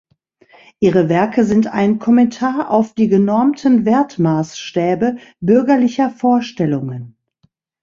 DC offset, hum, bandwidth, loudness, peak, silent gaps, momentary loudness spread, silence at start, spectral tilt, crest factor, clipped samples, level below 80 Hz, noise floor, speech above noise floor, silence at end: under 0.1%; none; 7.4 kHz; -15 LUFS; -2 dBFS; none; 7 LU; 0.8 s; -7.5 dB/octave; 14 dB; under 0.1%; -54 dBFS; -61 dBFS; 46 dB; 0.75 s